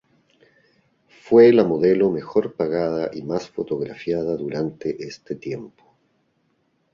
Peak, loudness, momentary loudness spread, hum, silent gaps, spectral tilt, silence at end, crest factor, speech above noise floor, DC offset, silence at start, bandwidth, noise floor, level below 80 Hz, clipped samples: -2 dBFS; -21 LUFS; 18 LU; none; none; -7.5 dB/octave; 1.25 s; 20 dB; 47 dB; under 0.1%; 1.25 s; 7.2 kHz; -67 dBFS; -60 dBFS; under 0.1%